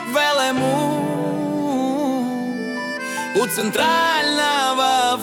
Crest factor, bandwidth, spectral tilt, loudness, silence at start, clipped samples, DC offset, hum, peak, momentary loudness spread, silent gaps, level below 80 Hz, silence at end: 14 dB; 18 kHz; -3.5 dB/octave; -19 LUFS; 0 s; under 0.1%; under 0.1%; none; -4 dBFS; 8 LU; none; -64 dBFS; 0 s